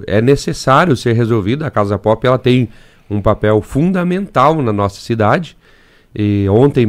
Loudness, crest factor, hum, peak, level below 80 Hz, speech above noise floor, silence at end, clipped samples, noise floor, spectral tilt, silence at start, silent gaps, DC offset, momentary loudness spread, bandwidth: -14 LUFS; 14 dB; none; 0 dBFS; -38 dBFS; 34 dB; 0 s; under 0.1%; -47 dBFS; -7 dB/octave; 0 s; none; under 0.1%; 7 LU; 14 kHz